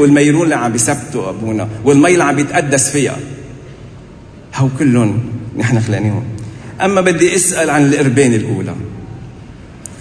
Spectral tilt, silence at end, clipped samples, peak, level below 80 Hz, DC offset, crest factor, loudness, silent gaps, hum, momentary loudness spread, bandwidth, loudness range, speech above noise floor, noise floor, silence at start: -5 dB/octave; 0 s; under 0.1%; 0 dBFS; -44 dBFS; under 0.1%; 14 dB; -13 LUFS; none; none; 20 LU; 11 kHz; 4 LU; 23 dB; -35 dBFS; 0 s